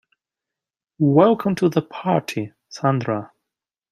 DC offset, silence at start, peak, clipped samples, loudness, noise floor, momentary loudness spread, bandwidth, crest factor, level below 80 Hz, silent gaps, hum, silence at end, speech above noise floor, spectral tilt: under 0.1%; 1 s; -2 dBFS; under 0.1%; -20 LUFS; -88 dBFS; 13 LU; 14.5 kHz; 20 dB; -64 dBFS; none; none; 0.65 s; 69 dB; -7.5 dB/octave